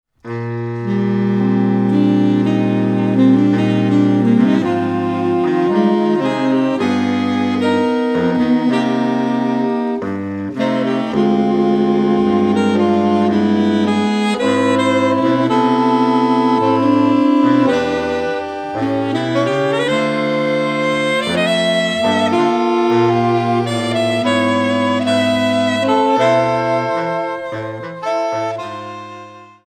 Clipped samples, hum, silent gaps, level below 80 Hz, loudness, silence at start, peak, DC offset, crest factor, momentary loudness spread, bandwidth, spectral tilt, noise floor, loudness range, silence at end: under 0.1%; none; none; -54 dBFS; -15 LUFS; 0.25 s; 0 dBFS; under 0.1%; 14 dB; 8 LU; 9.8 kHz; -6.5 dB/octave; -37 dBFS; 3 LU; 0.25 s